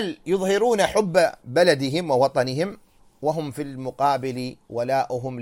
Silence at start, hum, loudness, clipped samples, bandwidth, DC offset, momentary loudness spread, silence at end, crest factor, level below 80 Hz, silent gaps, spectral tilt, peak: 0 s; none; -23 LUFS; under 0.1%; 16.5 kHz; under 0.1%; 11 LU; 0 s; 18 dB; -58 dBFS; none; -5 dB/octave; -6 dBFS